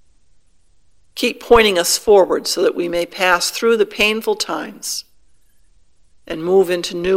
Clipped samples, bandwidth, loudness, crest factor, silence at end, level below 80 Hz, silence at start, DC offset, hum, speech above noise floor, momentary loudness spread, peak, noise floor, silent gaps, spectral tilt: under 0.1%; 16.5 kHz; -16 LUFS; 18 dB; 0 s; -44 dBFS; 1.15 s; 0.2%; none; 42 dB; 12 LU; 0 dBFS; -58 dBFS; none; -2.5 dB/octave